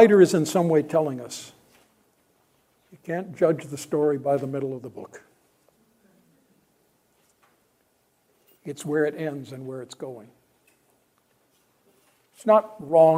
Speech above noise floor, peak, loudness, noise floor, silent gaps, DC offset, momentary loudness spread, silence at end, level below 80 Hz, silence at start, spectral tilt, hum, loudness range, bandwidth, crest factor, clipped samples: 45 dB; -2 dBFS; -24 LUFS; -68 dBFS; none; under 0.1%; 21 LU; 0 s; -74 dBFS; 0 s; -6 dB/octave; none; 12 LU; 16 kHz; 24 dB; under 0.1%